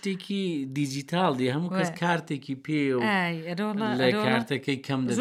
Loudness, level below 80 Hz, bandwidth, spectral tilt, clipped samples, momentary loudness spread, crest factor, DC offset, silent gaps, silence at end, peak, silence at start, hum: -27 LUFS; -74 dBFS; 14.5 kHz; -5.5 dB/octave; under 0.1%; 6 LU; 20 dB; under 0.1%; none; 0 s; -8 dBFS; 0.05 s; none